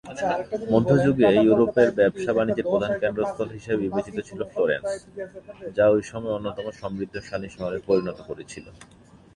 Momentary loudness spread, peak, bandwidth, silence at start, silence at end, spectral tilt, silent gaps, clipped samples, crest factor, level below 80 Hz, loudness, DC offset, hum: 17 LU; -4 dBFS; 10.5 kHz; 0.05 s; 0.5 s; -7 dB/octave; none; under 0.1%; 20 dB; -54 dBFS; -24 LUFS; under 0.1%; none